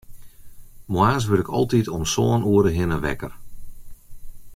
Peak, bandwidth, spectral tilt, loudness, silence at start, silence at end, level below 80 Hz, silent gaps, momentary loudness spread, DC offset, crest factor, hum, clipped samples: -4 dBFS; 16 kHz; -6 dB/octave; -21 LUFS; 0.1 s; 0 s; -40 dBFS; none; 10 LU; under 0.1%; 18 dB; none; under 0.1%